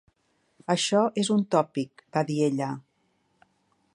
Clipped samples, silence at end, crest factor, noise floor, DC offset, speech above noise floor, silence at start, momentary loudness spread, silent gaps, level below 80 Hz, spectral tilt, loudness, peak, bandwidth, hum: under 0.1%; 1.15 s; 20 dB; -71 dBFS; under 0.1%; 45 dB; 0.7 s; 10 LU; none; -76 dBFS; -5 dB/octave; -26 LUFS; -8 dBFS; 11.5 kHz; none